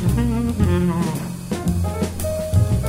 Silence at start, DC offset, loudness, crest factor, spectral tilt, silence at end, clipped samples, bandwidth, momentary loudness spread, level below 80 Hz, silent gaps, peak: 0 s; under 0.1%; -21 LUFS; 14 dB; -7 dB/octave; 0 s; under 0.1%; 16 kHz; 6 LU; -30 dBFS; none; -6 dBFS